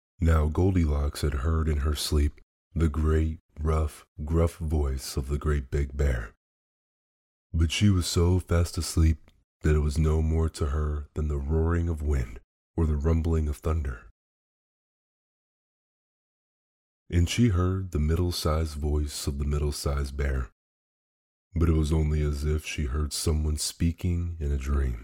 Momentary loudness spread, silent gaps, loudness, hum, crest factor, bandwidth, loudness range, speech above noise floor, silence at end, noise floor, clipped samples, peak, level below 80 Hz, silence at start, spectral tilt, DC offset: 7 LU; 2.43-2.71 s, 3.40-3.49 s, 4.08-4.16 s, 6.37-7.50 s, 9.44-9.60 s, 12.44-12.74 s, 14.11-17.06 s, 20.52-21.51 s; -28 LUFS; none; 16 dB; 16 kHz; 5 LU; over 64 dB; 0 s; under -90 dBFS; under 0.1%; -10 dBFS; -32 dBFS; 0.2 s; -6 dB/octave; under 0.1%